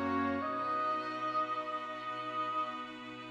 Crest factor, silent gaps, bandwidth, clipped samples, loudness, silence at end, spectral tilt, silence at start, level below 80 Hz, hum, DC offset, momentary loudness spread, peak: 14 dB; none; 9.4 kHz; under 0.1%; -36 LUFS; 0 s; -5.5 dB/octave; 0 s; -76 dBFS; none; under 0.1%; 7 LU; -24 dBFS